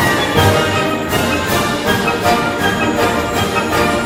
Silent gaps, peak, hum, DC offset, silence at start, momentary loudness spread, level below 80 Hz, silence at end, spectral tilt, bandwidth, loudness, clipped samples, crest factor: none; 0 dBFS; none; under 0.1%; 0 s; 4 LU; -36 dBFS; 0 s; -4.5 dB/octave; 17.5 kHz; -14 LUFS; under 0.1%; 14 dB